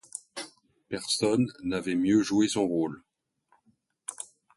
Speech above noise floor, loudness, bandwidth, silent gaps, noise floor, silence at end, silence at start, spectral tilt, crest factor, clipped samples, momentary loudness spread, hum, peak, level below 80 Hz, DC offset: 43 dB; -28 LUFS; 11.5 kHz; none; -70 dBFS; 0.3 s; 0.15 s; -4.5 dB/octave; 18 dB; under 0.1%; 17 LU; none; -12 dBFS; -64 dBFS; under 0.1%